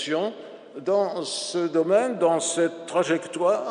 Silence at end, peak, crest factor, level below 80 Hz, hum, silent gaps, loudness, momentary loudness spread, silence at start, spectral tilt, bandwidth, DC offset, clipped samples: 0 s; -8 dBFS; 16 dB; -78 dBFS; none; none; -24 LUFS; 9 LU; 0 s; -3.5 dB/octave; 10.5 kHz; under 0.1%; under 0.1%